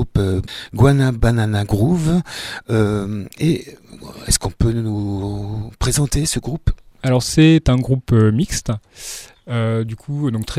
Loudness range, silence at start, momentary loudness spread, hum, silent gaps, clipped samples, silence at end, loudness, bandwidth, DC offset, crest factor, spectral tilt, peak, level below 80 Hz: 4 LU; 0 s; 14 LU; none; none; under 0.1%; 0 s; -18 LUFS; 15.5 kHz; under 0.1%; 18 dB; -5.5 dB/octave; 0 dBFS; -30 dBFS